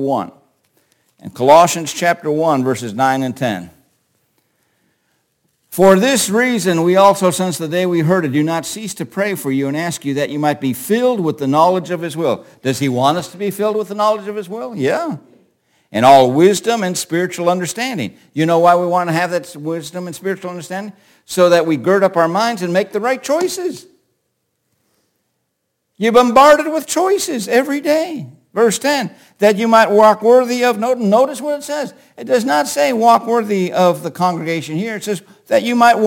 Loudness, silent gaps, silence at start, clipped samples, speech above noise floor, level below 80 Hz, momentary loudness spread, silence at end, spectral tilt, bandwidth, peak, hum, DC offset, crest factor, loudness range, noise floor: -15 LUFS; none; 0 s; under 0.1%; 57 dB; -60 dBFS; 14 LU; 0 s; -4.5 dB/octave; 17 kHz; 0 dBFS; none; under 0.1%; 16 dB; 5 LU; -71 dBFS